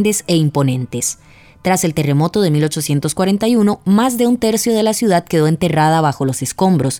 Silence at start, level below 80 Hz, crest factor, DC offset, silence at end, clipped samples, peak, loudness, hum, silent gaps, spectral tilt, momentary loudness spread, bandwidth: 0 s; -48 dBFS; 12 dB; under 0.1%; 0 s; under 0.1%; -2 dBFS; -15 LUFS; none; none; -5.5 dB/octave; 5 LU; 20 kHz